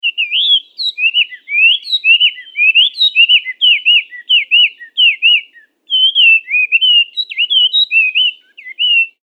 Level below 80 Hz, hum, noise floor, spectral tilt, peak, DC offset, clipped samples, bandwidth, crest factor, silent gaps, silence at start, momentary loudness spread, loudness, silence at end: under -90 dBFS; none; -41 dBFS; 6.5 dB/octave; 0 dBFS; under 0.1%; under 0.1%; 8.6 kHz; 12 dB; none; 0.05 s; 6 LU; -9 LUFS; 0.15 s